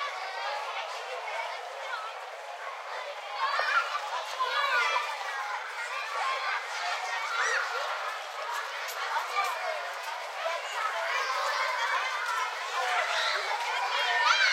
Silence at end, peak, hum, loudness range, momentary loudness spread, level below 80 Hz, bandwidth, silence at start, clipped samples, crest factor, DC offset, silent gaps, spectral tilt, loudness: 0 s; -10 dBFS; none; 4 LU; 10 LU; under -90 dBFS; 16 kHz; 0 s; under 0.1%; 22 dB; under 0.1%; none; 5.5 dB/octave; -30 LUFS